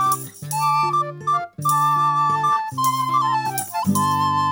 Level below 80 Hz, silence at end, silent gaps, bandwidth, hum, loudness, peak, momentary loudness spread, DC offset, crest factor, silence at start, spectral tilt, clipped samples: -66 dBFS; 0 s; none; over 20 kHz; none; -20 LUFS; -6 dBFS; 5 LU; under 0.1%; 14 dB; 0 s; -4 dB/octave; under 0.1%